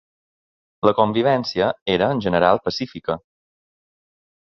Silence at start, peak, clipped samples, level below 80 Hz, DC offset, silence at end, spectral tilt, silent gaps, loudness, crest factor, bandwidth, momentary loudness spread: 0.85 s; -2 dBFS; under 0.1%; -52 dBFS; under 0.1%; 1.25 s; -6.5 dB/octave; 1.82-1.86 s; -20 LUFS; 20 dB; 7.2 kHz; 10 LU